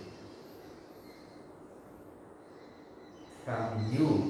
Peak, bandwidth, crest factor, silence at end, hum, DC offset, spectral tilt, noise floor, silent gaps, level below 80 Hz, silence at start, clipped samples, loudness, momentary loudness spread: -16 dBFS; 13.5 kHz; 20 dB; 0 s; none; under 0.1%; -8 dB/octave; -53 dBFS; none; -68 dBFS; 0 s; under 0.1%; -34 LUFS; 20 LU